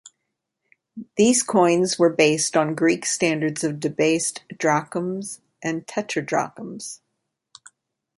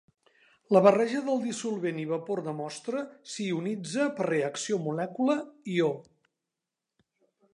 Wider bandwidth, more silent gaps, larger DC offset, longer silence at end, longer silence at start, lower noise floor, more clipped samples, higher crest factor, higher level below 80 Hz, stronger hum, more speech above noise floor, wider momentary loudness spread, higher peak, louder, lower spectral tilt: about the same, 11.5 kHz vs 11 kHz; neither; neither; second, 1.2 s vs 1.55 s; second, 0.05 s vs 0.7 s; second, -79 dBFS vs -88 dBFS; neither; about the same, 20 dB vs 24 dB; first, -66 dBFS vs -82 dBFS; neither; about the same, 58 dB vs 60 dB; about the same, 15 LU vs 13 LU; first, -2 dBFS vs -6 dBFS; first, -21 LUFS vs -29 LUFS; second, -4 dB/octave vs -5.5 dB/octave